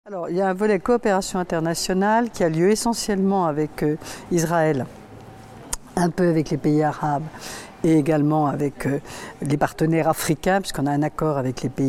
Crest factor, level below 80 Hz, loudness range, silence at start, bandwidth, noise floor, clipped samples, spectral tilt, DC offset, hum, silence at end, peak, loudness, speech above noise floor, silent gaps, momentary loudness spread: 16 dB; -46 dBFS; 3 LU; 0.05 s; 16.5 kHz; -42 dBFS; under 0.1%; -6 dB/octave; under 0.1%; none; 0 s; -6 dBFS; -22 LUFS; 20 dB; none; 9 LU